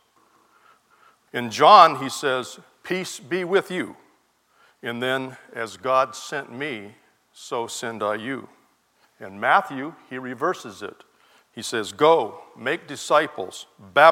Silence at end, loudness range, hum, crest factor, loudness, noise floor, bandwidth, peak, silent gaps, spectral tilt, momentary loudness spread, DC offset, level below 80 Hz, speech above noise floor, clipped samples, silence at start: 0 s; 8 LU; none; 22 dB; -22 LUFS; -63 dBFS; 16.5 kHz; 0 dBFS; none; -3.5 dB/octave; 18 LU; under 0.1%; -78 dBFS; 41 dB; under 0.1%; 1.35 s